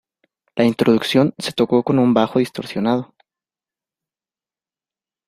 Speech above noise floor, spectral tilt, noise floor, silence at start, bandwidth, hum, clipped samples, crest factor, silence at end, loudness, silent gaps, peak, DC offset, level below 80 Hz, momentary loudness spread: over 73 dB; -6.5 dB/octave; under -90 dBFS; 0.55 s; 14.5 kHz; none; under 0.1%; 18 dB; 2.25 s; -18 LUFS; none; -2 dBFS; under 0.1%; -60 dBFS; 8 LU